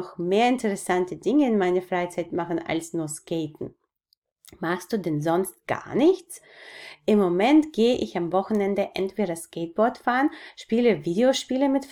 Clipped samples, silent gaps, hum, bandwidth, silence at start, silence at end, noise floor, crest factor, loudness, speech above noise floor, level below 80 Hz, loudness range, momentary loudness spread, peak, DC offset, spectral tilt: under 0.1%; 4.17-4.22 s; none; 16.5 kHz; 0 s; 0 s; -72 dBFS; 16 dB; -24 LUFS; 48 dB; -62 dBFS; 6 LU; 11 LU; -8 dBFS; under 0.1%; -5.5 dB/octave